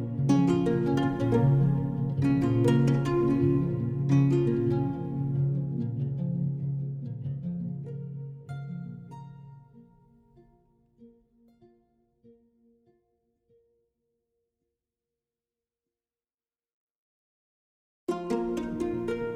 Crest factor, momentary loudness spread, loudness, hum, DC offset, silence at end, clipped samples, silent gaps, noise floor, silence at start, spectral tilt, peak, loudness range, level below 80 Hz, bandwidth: 18 dB; 16 LU; -27 LUFS; none; under 0.1%; 0 s; under 0.1%; 16.34-16.38 s, 16.74-18.07 s; under -90 dBFS; 0 s; -9 dB/octave; -12 dBFS; 18 LU; -54 dBFS; 9 kHz